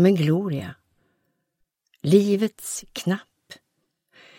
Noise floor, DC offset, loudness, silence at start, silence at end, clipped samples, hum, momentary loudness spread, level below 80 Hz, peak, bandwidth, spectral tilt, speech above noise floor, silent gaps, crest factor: -75 dBFS; under 0.1%; -23 LUFS; 0 s; 0.85 s; under 0.1%; none; 13 LU; -64 dBFS; -4 dBFS; 16.5 kHz; -6.5 dB/octave; 54 dB; none; 20 dB